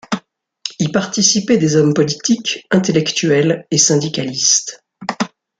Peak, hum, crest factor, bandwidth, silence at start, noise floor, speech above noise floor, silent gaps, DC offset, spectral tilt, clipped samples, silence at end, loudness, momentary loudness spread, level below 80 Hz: 0 dBFS; none; 16 dB; 10 kHz; 0.1 s; -38 dBFS; 23 dB; none; under 0.1%; -3.5 dB/octave; under 0.1%; 0.3 s; -15 LUFS; 13 LU; -58 dBFS